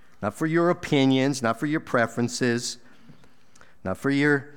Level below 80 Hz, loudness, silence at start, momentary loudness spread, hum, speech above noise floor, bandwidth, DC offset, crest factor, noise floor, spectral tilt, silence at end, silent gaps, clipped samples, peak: -62 dBFS; -24 LUFS; 0.2 s; 11 LU; none; 33 dB; 17 kHz; 0.5%; 16 dB; -57 dBFS; -5 dB/octave; 0.05 s; none; under 0.1%; -8 dBFS